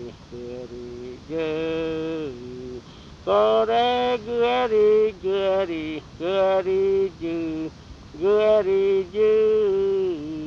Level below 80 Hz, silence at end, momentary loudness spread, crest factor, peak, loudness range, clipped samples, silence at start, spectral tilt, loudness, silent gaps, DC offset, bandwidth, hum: -52 dBFS; 0 s; 17 LU; 14 dB; -8 dBFS; 4 LU; under 0.1%; 0 s; -6.5 dB/octave; -22 LUFS; none; under 0.1%; 7.2 kHz; none